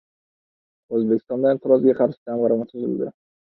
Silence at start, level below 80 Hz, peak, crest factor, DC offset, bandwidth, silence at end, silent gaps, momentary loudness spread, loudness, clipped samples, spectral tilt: 0.9 s; -68 dBFS; -4 dBFS; 18 dB; under 0.1%; 4.3 kHz; 0.5 s; 2.17-2.26 s; 10 LU; -21 LUFS; under 0.1%; -12 dB/octave